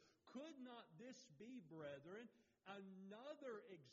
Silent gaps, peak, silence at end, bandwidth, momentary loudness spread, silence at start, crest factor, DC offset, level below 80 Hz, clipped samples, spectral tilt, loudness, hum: none; -42 dBFS; 0 s; 7.4 kHz; 5 LU; 0 s; 16 dB; under 0.1%; under -90 dBFS; under 0.1%; -4.5 dB/octave; -59 LUFS; none